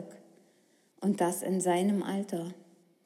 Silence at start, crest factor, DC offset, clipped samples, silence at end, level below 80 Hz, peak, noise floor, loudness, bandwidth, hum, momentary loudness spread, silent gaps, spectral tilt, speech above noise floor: 0 s; 16 dB; under 0.1%; under 0.1%; 0.45 s; under -90 dBFS; -16 dBFS; -67 dBFS; -31 LUFS; 15.5 kHz; none; 12 LU; none; -5.5 dB/octave; 37 dB